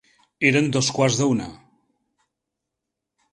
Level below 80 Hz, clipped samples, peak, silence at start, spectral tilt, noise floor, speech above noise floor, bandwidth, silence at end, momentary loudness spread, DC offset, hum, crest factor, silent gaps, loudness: -58 dBFS; under 0.1%; -2 dBFS; 0.4 s; -4.5 dB/octave; -83 dBFS; 63 dB; 11.5 kHz; 1.75 s; 7 LU; under 0.1%; none; 22 dB; none; -20 LUFS